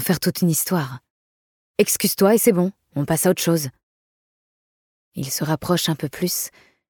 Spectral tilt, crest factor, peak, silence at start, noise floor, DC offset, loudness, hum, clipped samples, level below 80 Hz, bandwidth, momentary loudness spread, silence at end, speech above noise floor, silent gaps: -4.5 dB/octave; 18 dB; -4 dBFS; 0 s; under -90 dBFS; under 0.1%; -20 LUFS; none; under 0.1%; -58 dBFS; 19 kHz; 15 LU; 0.4 s; over 70 dB; 1.10-1.74 s, 3.83-5.12 s